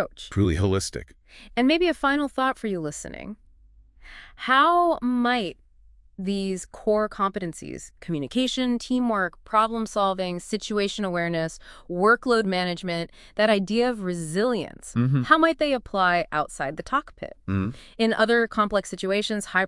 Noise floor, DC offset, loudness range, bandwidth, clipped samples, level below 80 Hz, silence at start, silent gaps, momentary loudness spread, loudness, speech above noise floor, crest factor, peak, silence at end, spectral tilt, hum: -54 dBFS; under 0.1%; 3 LU; 12 kHz; under 0.1%; -50 dBFS; 0 s; none; 13 LU; -24 LUFS; 30 dB; 22 dB; -2 dBFS; 0 s; -5 dB/octave; none